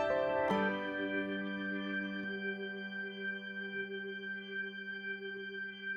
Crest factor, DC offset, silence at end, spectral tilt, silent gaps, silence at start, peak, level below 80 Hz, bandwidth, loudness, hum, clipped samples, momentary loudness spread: 16 dB; under 0.1%; 0 s; -6.5 dB/octave; none; 0 s; -22 dBFS; -72 dBFS; 9.6 kHz; -38 LUFS; none; under 0.1%; 9 LU